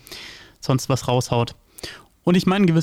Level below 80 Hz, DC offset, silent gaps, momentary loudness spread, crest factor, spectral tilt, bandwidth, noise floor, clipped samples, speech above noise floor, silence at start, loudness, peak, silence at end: -52 dBFS; under 0.1%; none; 19 LU; 16 dB; -6 dB/octave; 16 kHz; -40 dBFS; under 0.1%; 22 dB; 0.1 s; -21 LUFS; -6 dBFS; 0 s